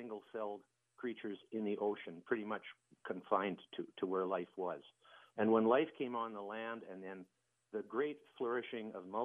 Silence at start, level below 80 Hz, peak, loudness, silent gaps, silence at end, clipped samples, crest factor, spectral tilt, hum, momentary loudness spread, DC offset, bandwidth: 0 s; under -90 dBFS; -18 dBFS; -40 LUFS; none; 0 s; under 0.1%; 22 dB; -7.5 dB/octave; none; 15 LU; under 0.1%; 3.7 kHz